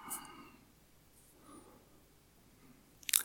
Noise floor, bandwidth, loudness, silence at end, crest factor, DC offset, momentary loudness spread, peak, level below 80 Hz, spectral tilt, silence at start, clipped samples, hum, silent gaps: -65 dBFS; 19 kHz; -39 LUFS; 0 s; 40 dB; under 0.1%; 20 LU; -4 dBFS; -72 dBFS; 1 dB/octave; 0 s; under 0.1%; none; none